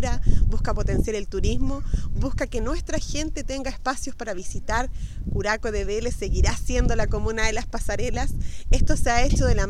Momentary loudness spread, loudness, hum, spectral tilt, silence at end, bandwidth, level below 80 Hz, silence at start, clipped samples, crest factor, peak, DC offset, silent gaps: 8 LU; -26 LUFS; none; -5 dB/octave; 0 s; 12 kHz; -24 dBFS; 0 s; under 0.1%; 18 dB; -4 dBFS; under 0.1%; none